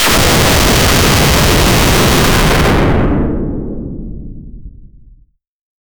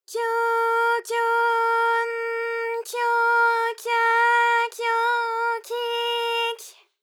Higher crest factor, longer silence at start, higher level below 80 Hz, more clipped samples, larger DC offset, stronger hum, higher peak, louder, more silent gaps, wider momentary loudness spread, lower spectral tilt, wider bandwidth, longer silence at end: about the same, 12 dB vs 12 dB; about the same, 0 s vs 0.1 s; first, -18 dBFS vs under -90 dBFS; neither; neither; neither; first, 0 dBFS vs -10 dBFS; first, -10 LUFS vs -22 LUFS; neither; first, 16 LU vs 8 LU; first, -4 dB/octave vs 3.5 dB/octave; first, over 20 kHz vs 17.5 kHz; first, 1.15 s vs 0.3 s